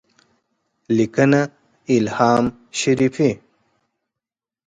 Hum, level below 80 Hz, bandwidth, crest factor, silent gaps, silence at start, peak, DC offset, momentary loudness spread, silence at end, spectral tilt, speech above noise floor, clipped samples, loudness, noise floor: none; -56 dBFS; 9.4 kHz; 18 dB; none; 0.9 s; -2 dBFS; under 0.1%; 9 LU; 1.3 s; -6 dB/octave; 70 dB; under 0.1%; -19 LUFS; -87 dBFS